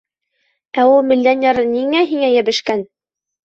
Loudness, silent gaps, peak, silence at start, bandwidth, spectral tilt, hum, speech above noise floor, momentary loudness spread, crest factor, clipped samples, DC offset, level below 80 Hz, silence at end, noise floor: -15 LUFS; none; -2 dBFS; 0.75 s; 7.8 kHz; -4 dB/octave; none; 53 dB; 10 LU; 14 dB; under 0.1%; under 0.1%; -58 dBFS; 0.6 s; -67 dBFS